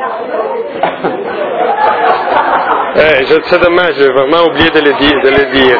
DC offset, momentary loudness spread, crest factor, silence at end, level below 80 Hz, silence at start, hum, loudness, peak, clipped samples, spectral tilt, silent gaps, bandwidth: under 0.1%; 8 LU; 10 dB; 0 s; -38 dBFS; 0 s; none; -9 LUFS; 0 dBFS; 0.8%; -6.5 dB/octave; none; 5.4 kHz